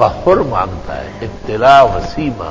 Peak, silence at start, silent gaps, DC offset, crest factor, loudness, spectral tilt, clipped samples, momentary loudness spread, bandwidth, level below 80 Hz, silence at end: 0 dBFS; 0 s; none; under 0.1%; 12 dB; -12 LUFS; -6.5 dB/octave; 0.6%; 17 LU; 8 kHz; -32 dBFS; 0 s